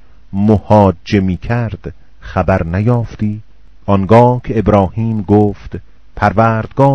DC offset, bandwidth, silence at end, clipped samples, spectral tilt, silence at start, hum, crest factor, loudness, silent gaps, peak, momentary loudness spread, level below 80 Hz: 2%; 6.6 kHz; 0 s; 0.7%; -9 dB/octave; 0.35 s; none; 12 dB; -13 LUFS; none; 0 dBFS; 18 LU; -34 dBFS